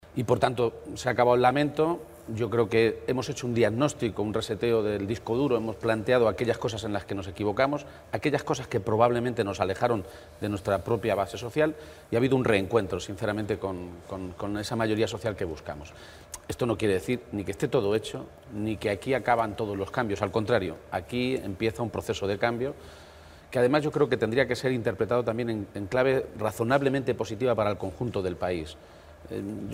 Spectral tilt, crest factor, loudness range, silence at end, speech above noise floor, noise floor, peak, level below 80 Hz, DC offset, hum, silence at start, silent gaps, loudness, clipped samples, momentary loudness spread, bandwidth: -6 dB/octave; 20 dB; 4 LU; 0 s; 22 dB; -49 dBFS; -6 dBFS; -54 dBFS; under 0.1%; none; 0.05 s; none; -28 LUFS; under 0.1%; 11 LU; 16 kHz